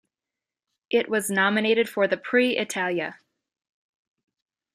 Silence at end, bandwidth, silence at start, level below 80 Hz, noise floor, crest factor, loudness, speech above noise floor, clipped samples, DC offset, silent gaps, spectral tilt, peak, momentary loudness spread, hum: 1.6 s; 14.5 kHz; 0.9 s; -76 dBFS; -89 dBFS; 20 dB; -23 LUFS; 66 dB; under 0.1%; under 0.1%; none; -3.5 dB/octave; -6 dBFS; 5 LU; none